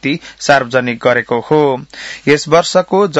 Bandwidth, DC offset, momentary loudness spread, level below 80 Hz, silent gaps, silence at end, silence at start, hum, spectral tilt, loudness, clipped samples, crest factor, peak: 8.4 kHz; under 0.1%; 8 LU; -52 dBFS; none; 0 s; 0.05 s; none; -4.5 dB/octave; -13 LUFS; 0.2%; 12 dB; 0 dBFS